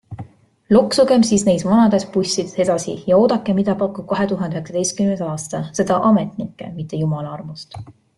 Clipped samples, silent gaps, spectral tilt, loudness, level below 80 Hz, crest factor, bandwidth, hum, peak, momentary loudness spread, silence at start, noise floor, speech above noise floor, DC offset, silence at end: under 0.1%; none; -5.5 dB/octave; -18 LUFS; -52 dBFS; 16 dB; 12 kHz; none; -2 dBFS; 16 LU; 0.1 s; -39 dBFS; 21 dB; under 0.1%; 0.25 s